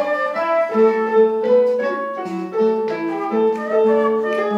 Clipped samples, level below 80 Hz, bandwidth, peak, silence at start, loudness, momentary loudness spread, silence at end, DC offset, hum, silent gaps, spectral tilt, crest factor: under 0.1%; -72 dBFS; 7.4 kHz; -4 dBFS; 0 s; -18 LUFS; 7 LU; 0 s; under 0.1%; none; none; -7 dB/octave; 12 dB